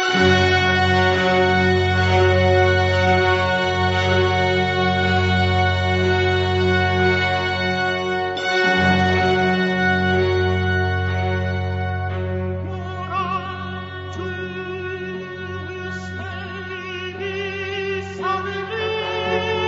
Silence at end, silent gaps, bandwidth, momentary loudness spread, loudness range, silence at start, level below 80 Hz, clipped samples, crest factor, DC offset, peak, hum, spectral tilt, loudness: 0 s; none; 7.8 kHz; 13 LU; 11 LU; 0 s; -44 dBFS; under 0.1%; 16 dB; under 0.1%; -4 dBFS; none; -6 dB/octave; -19 LUFS